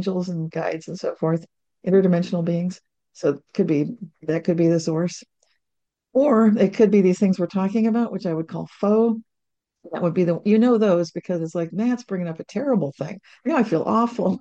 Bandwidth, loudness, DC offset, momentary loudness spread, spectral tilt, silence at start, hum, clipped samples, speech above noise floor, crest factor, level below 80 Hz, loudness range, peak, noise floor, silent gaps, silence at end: 8.2 kHz; -22 LUFS; under 0.1%; 12 LU; -8 dB/octave; 0 s; none; under 0.1%; 61 dB; 16 dB; -68 dBFS; 4 LU; -6 dBFS; -81 dBFS; none; 0 s